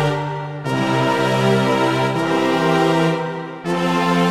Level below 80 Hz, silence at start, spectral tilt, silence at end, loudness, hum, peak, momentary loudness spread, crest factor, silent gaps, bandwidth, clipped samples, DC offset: -56 dBFS; 0 s; -6 dB/octave; 0 s; -18 LUFS; none; -4 dBFS; 8 LU; 14 dB; none; 15.5 kHz; under 0.1%; 0.3%